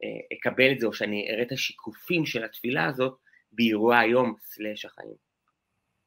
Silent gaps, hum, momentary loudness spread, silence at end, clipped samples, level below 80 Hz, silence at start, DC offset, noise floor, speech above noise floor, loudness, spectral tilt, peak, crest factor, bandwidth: none; none; 18 LU; 0.9 s; under 0.1%; -72 dBFS; 0 s; under 0.1%; -79 dBFS; 52 dB; -26 LUFS; -5 dB/octave; -2 dBFS; 24 dB; 16 kHz